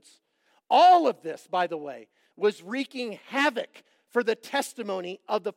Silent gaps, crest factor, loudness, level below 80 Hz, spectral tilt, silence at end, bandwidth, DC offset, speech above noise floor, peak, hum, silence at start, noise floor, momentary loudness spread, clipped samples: none; 18 dB; -26 LUFS; under -90 dBFS; -3.5 dB/octave; 0.05 s; 16 kHz; under 0.1%; 43 dB; -8 dBFS; none; 0.7 s; -69 dBFS; 18 LU; under 0.1%